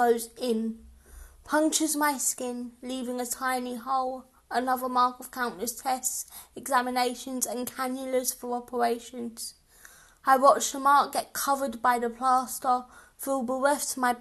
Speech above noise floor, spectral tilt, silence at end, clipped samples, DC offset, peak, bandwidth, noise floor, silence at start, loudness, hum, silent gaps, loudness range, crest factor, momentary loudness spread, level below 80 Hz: 27 dB; -2 dB/octave; 0 s; under 0.1%; under 0.1%; -6 dBFS; 13 kHz; -54 dBFS; 0 s; -27 LUFS; none; none; 5 LU; 22 dB; 12 LU; -62 dBFS